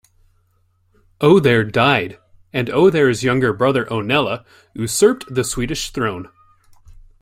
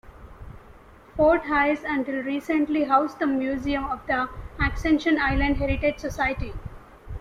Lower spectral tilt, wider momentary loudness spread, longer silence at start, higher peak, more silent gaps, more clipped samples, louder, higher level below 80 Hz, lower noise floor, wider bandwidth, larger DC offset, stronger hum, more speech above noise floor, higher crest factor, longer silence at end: second, -5 dB/octave vs -6.5 dB/octave; about the same, 13 LU vs 12 LU; first, 1.2 s vs 0.05 s; first, 0 dBFS vs -6 dBFS; neither; neither; first, -17 LUFS vs -24 LUFS; second, -44 dBFS vs -38 dBFS; first, -61 dBFS vs -49 dBFS; first, 16 kHz vs 13.5 kHz; neither; neither; first, 44 dB vs 25 dB; about the same, 18 dB vs 18 dB; first, 0.95 s vs 0 s